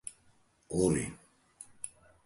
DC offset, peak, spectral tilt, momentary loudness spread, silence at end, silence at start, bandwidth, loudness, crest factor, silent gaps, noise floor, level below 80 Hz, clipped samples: under 0.1%; -16 dBFS; -5.5 dB/octave; 23 LU; 0.4 s; 0.05 s; 11.5 kHz; -34 LUFS; 22 dB; none; -67 dBFS; -56 dBFS; under 0.1%